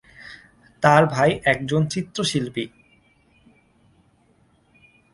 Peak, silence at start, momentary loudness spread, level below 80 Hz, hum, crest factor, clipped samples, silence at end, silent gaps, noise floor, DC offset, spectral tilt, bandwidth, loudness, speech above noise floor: 0 dBFS; 0.2 s; 23 LU; -56 dBFS; none; 24 dB; under 0.1%; 2.45 s; none; -60 dBFS; under 0.1%; -5 dB/octave; 11.5 kHz; -20 LUFS; 40 dB